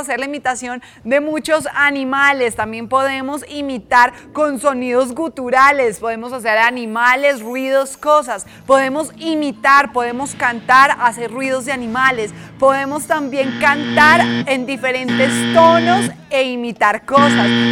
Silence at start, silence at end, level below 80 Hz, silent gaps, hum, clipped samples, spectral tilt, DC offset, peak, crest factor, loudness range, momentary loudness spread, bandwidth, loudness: 0 s; 0 s; -52 dBFS; none; none; under 0.1%; -4 dB/octave; under 0.1%; 0 dBFS; 14 dB; 3 LU; 11 LU; 17 kHz; -15 LUFS